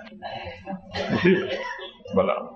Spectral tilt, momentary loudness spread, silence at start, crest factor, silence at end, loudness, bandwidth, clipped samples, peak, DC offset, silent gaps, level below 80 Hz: -7 dB/octave; 16 LU; 0 s; 20 dB; 0 s; -25 LUFS; 7.2 kHz; under 0.1%; -6 dBFS; under 0.1%; none; -56 dBFS